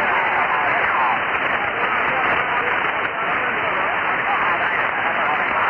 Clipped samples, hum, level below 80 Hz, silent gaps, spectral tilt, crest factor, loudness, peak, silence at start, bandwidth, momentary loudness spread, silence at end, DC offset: under 0.1%; none; -54 dBFS; none; -5.5 dB/octave; 14 dB; -19 LUFS; -6 dBFS; 0 s; 6.8 kHz; 2 LU; 0 s; under 0.1%